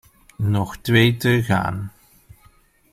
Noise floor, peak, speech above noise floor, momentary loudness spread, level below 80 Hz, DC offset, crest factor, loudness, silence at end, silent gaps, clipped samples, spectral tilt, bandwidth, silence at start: -55 dBFS; -2 dBFS; 36 dB; 12 LU; -48 dBFS; under 0.1%; 20 dB; -19 LUFS; 1.05 s; none; under 0.1%; -6 dB/octave; 16 kHz; 0.4 s